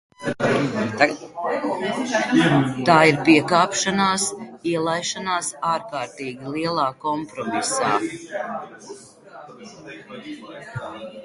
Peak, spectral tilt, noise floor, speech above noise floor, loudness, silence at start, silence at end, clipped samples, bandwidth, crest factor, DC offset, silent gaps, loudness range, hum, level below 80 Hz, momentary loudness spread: 0 dBFS; -4 dB/octave; -43 dBFS; 21 dB; -21 LUFS; 0.2 s; 0 s; under 0.1%; 11.5 kHz; 22 dB; under 0.1%; none; 9 LU; none; -60 dBFS; 21 LU